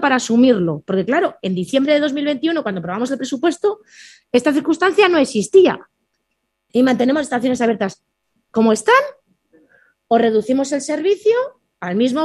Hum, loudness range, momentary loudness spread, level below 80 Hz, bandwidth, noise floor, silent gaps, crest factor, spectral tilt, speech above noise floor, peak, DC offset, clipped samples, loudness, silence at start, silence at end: none; 3 LU; 9 LU; -60 dBFS; 12 kHz; -73 dBFS; none; 16 dB; -5 dB/octave; 56 dB; 0 dBFS; under 0.1%; under 0.1%; -17 LUFS; 0 s; 0 s